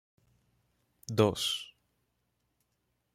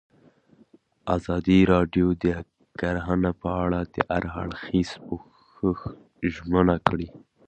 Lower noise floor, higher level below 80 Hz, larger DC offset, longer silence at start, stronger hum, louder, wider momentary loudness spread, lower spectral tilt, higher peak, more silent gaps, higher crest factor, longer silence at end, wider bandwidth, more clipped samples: first, -79 dBFS vs -58 dBFS; second, -68 dBFS vs -42 dBFS; neither; about the same, 1.1 s vs 1.05 s; neither; second, -31 LUFS vs -25 LUFS; first, 22 LU vs 15 LU; second, -4.5 dB/octave vs -8 dB/octave; second, -10 dBFS vs 0 dBFS; neither; about the same, 26 dB vs 24 dB; first, 1.5 s vs 0.3 s; first, 16 kHz vs 8.4 kHz; neither